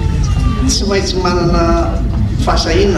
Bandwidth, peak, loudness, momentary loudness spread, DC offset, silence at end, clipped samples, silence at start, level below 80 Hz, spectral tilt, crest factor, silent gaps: 12 kHz; -2 dBFS; -14 LUFS; 3 LU; under 0.1%; 0 s; under 0.1%; 0 s; -16 dBFS; -5.5 dB/octave; 10 dB; none